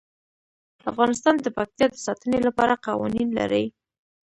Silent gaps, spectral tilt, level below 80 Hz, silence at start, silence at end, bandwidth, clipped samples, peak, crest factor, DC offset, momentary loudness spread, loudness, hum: none; -5 dB/octave; -56 dBFS; 0.85 s; 0.55 s; 11 kHz; under 0.1%; -4 dBFS; 20 dB; under 0.1%; 8 LU; -23 LUFS; none